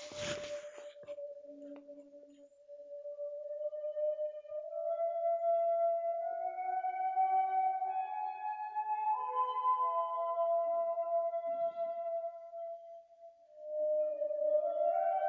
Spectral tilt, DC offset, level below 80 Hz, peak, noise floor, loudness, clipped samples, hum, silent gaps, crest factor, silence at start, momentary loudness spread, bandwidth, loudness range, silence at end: -3.5 dB/octave; under 0.1%; -80 dBFS; -22 dBFS; -59 dBFS; -36 LUFS; under 0.1%; none; none; 14 dB; 0 s; 18 LU; 7.6 kHz; 9 LU; 0 s